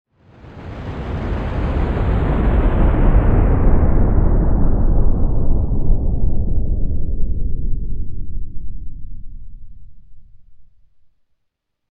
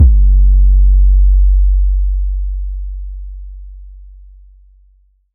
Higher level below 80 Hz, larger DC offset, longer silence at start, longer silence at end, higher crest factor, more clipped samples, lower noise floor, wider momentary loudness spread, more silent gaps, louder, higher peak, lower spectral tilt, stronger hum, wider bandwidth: second, -18 dBFS vs -12 dBFS; neither; first, 0.45 s vs 0 s; about the same, 1.25 s vs 1.35 s; about the same, 14 dB vs 10 dB; neither; first, -71 dBFS vs -51 dBFS; about the same, 19 LU vs 20 LU; neither; second, -20 LUFS vs -13 LUFS; about the same, -2 dBFS vs 0 dBFS; second, -10.5 dB/octave vs -17 dB/octave; neither; first, 3.6 kHz vs 0.5 kHz